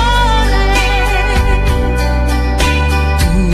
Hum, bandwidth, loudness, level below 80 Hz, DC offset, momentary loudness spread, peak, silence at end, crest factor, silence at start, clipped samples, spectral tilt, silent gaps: none; 14 kHz; -13 LUFS; -14 dBFS; under 0.1%; 3 LU; 0 dBFS; 0 s; 12 dB; 0 s; under 0.1%; -5 dB/octave; none